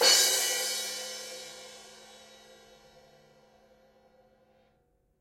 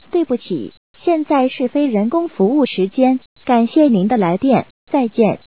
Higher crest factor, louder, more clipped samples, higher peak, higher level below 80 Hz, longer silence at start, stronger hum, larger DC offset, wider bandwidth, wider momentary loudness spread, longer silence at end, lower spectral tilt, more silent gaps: first, 24 dB vs 14 dB; second, -27 LUFS vs -16 LUFS; neither; second, -8 dBFS vs -2 dBFS; second, -76 dBFS vs -60 dBFS; second, 0 s vs 0.15 s; neither; second, under 0.1% vs 0.4%; first, 16 kHz vs 4 kHz; first, 29 LU vs 8 LU; first, 3.05 s vs 0.15 s; second, 2.5 dB/octave vs -11.5 dB/octave; second, none vs 0.77-0.94 s, 3.26-3.36 s, 4.70-4.87 s